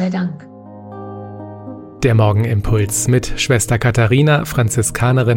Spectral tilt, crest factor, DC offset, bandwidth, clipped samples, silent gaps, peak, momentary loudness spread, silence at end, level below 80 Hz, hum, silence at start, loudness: -5.5 dB/octave; 14 dB; under 0.1%; 17 kHz; under 0.1%; none; -2 dBFS; 19 LU; 0 s; -32 dBFS; none; 0 s; -15 LUFS